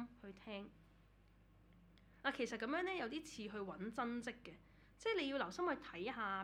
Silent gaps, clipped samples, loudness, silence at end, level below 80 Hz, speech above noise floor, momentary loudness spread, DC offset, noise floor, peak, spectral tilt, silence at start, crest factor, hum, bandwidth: none; under 0.1%; -44 LUFS; 0 s; -72 dBFS; 25 dB; 14 LU; under 0.1%; -68 dBFS; -24 dBFS; -4.5 dB/octave; 0 s; 22 dB; none; 14 kHz